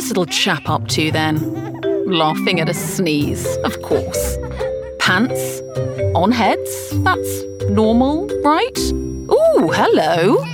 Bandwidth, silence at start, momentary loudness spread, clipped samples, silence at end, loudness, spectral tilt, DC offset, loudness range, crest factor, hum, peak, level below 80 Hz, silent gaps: over 20 kHz; 0 s; 9 LU; under 0.1%; 0 s; -17 LUFS; -5 dB/octave; under 0.1%; 3 LU; 16 dB; none; -2 dBFS; -36 dBFS; none